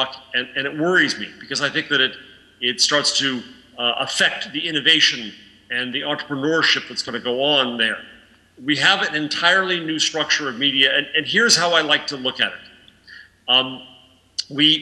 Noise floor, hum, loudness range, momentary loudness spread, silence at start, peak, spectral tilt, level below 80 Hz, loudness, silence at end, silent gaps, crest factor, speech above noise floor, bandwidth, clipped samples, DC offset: -45 dBFS; none; 3 LU; 12 LU; 0 s; -2 dBFS; -1.5 dB/octave; -66 dBFS; -18 LUFS; 0 s; none; 20 dB; 25 dB; 13 kHz; under 0.1%; under 0.1%